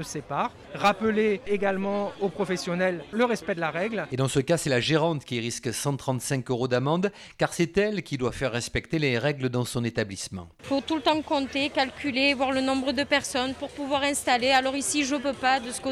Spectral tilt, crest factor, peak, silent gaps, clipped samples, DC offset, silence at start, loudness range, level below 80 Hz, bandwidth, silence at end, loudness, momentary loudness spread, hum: -4.5 dB/octave; 18 dB; -8 dBFS; none; under 0.1%; under 0.1%; 0 s; 3 LU; -54 dBFS; 14.5 kHz; 0 s; -26 LUFS; 7 LU; none